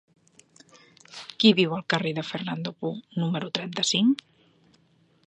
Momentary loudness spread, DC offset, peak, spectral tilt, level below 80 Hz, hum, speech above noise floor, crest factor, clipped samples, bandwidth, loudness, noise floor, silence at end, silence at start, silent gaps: 13 LU; under 0.1%; -6 dBFS; -4.5 dB/octave; -72 dBFS; none; 38 dB; 22 dB; under 0.1%; 9.4 kHz; -25 LUFS; -63 dBFS; 1.15 s; 1.1 s; none